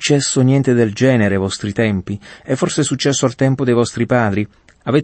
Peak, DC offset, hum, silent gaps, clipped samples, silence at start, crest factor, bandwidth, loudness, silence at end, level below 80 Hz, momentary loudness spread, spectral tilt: -2 dBFS; under 0.1%; none; none; under 0.1%; 0 s; 14 dB; 8.8 kHz; -16 LUFS; 0 s; -50 dBFS; 9 LU; -5.5 dB/octave